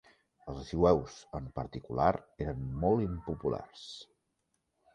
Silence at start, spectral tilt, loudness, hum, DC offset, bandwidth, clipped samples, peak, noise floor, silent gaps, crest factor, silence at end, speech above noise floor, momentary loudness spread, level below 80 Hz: 0.45 s; -7.5 dB/octave; -33 LUFS; none; under 0.1%; 10.5 kHz; under 0.1%; -12 dBFS; -80 dBFS; none; 22 dB; 0.9 s; 48 dB; 18 LU; -50 dBFS